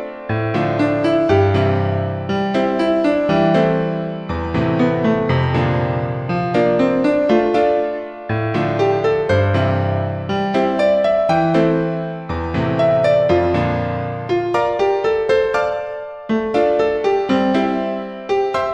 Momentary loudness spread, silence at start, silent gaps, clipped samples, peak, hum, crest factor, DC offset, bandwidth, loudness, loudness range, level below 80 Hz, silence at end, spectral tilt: 7 LU; 0 s; none; under 0.1%; -2 dBFS; none; 14 dB; under 0.1%; 9.4 kHz; -17 LUFS; 2 LU; -42 dBFS; 0 s; -8 dB/octave